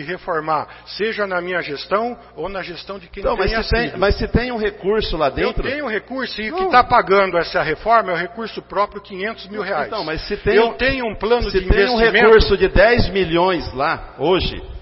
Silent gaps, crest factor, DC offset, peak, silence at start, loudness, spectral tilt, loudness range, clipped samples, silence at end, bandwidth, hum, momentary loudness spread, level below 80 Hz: none; 18 dB; under 0.1%; 0 dBFS; 0 s; -18 LUFS; -8.5 dB/octave; 6 LU; under 0.1%; 0 s; 5.8 kHz; none; 13 LU; -30 dBFS